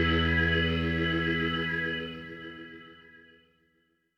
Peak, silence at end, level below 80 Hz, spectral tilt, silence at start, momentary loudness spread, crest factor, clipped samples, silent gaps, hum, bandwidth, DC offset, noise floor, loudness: -14 dBFS; 1.15 s; -42 dBFS; -7 dB/octave; 0 s; 19 LU; 16 dB; under 0.1%; none; 60 Hz at -60 dBFS; 6.6 kHz; under 0.1%; -72 dBFS; -28 LUFS